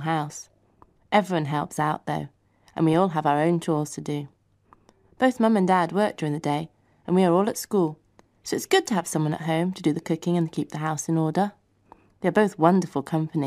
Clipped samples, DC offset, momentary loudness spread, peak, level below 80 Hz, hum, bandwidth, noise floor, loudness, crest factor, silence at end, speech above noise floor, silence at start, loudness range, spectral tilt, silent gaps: under 0.1%; under 0.1%; 11 LU; -2 dBFS; -66 dBFS; none; 15.5 kHz; -59 dBFS; -24 LUFS; 22 dB; 0 s; 36 dB; 0 s; 2 LU; -6 dB/octave; none